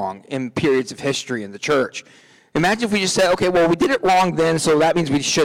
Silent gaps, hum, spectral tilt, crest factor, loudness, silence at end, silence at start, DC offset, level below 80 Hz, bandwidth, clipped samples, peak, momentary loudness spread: none; none; -4 dB/octave; 10 dB; -18 LUFS; 0 s; 0 s; under 0.1%; -52 dBFS; 17.5 kHz; under 0.1%; -8 dBFS; 10 LU